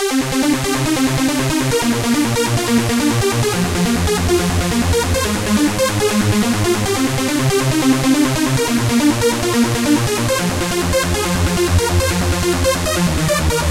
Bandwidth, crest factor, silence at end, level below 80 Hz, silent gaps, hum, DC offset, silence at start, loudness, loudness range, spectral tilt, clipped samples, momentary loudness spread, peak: 16 kHz; 14 dB; 0 s; -30 dBFS; none; none; 0.4%; 0 s; -16 LUFS; 1 LU; -4.5 dB/octave; under 0.1%; 2 LU; -2 dBFS